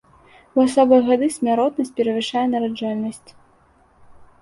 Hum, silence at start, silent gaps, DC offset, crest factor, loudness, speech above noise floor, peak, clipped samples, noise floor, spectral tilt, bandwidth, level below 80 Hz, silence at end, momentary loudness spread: none; 0.55 s; none; under 0.1%; 18 dB; -19 LUFS; 37 dB; -2 dBFS; under 0.1%; -56 dBFS; -5 dB/octave; 11.5 kHz; -60 dBFS; 0.15 s; 10 LU